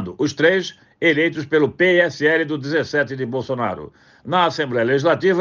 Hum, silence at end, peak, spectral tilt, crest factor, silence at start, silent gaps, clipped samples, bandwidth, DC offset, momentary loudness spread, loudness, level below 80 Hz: none; 0 s; -4 dBFS; -5.5 dB/octave; 16 dB; 0 s; none; under 0.1%; 7.2 kHz; under 0.1%; 8 LU; -19 LUFS; -62 dBFS